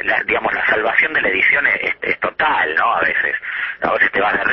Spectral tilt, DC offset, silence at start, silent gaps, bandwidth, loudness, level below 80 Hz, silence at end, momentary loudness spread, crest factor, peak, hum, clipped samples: -6 dB/octave; under 0.1%; 0 s; none; 6 kHz; -16 LUFS; -52 dBFS; 0 s; 6 LU; 16 dB; -2 dBFS; none; under 0.1%